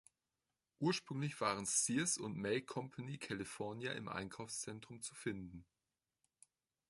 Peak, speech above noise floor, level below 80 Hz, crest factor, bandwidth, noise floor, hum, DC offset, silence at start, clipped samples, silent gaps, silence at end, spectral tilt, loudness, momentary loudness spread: -22 dBFS; over 48 dB; -74 dBFS; 20 dB; 12 kHz; under -90 dBFS; none; under 0.1%; 0.8 s; under 0.1%; none; 1.25 s; -3.5 dB/octave; -41 LUFS; 13 LU